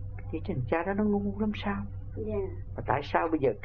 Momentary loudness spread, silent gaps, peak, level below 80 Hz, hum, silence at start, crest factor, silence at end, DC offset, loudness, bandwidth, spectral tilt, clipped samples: 10 LU; none; -10 dBFS; -44 dBFS; none; 0 s; 22 dB; 0 s; 0.4%; -31 LUFS; 6.2 kHz; -9 dB/octave; under 0.1%